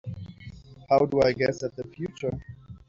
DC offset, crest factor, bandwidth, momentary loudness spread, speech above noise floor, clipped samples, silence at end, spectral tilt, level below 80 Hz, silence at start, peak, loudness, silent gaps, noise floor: under 0.1%; 18 dB; 7.6 kHz; 22 LU; 20 dB; under 0.1%; 0.1 s; -5.5 dB/octave; -54 dBFS; 0.05 s; -8 dBFS; -26 LUFS; none; -45 dBFS